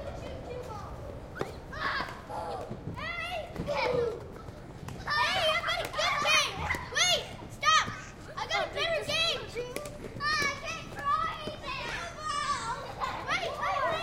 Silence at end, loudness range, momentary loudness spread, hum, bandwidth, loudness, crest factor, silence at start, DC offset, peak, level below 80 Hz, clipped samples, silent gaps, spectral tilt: 0 s; 8 LU; 16 LU; none; 16.5 kHz; -31 LUFS; 20 dB; 0 s; under 0.1%; -12 dBFS; -50 dBFS; under 0.1%; none; -2.5 dB/octave